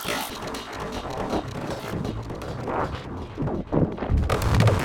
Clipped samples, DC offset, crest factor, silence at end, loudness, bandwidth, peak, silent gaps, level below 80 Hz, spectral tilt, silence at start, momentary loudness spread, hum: under 0.1%; under 0.1%; 20 dB; 0 s; -28 LUFS; 17.5 kHz; -6 dBFS; none; -34 dBFS; -6 dB/octave; 0 s; 10 LU; none